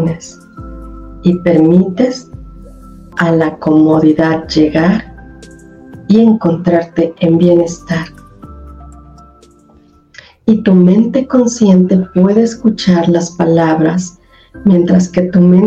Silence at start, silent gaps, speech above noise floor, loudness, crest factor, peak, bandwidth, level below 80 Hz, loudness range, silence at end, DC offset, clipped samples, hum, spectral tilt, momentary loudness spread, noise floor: 0 s; none; 36 dB; -11 LUFS; 12 dB; 0 dBFS; 8 kHz; -38 dBFS; 5 LU; 0 s; under 0.1%; under 0.1%; none; -7.5 dB/octave; 16 LU; -45 dBFS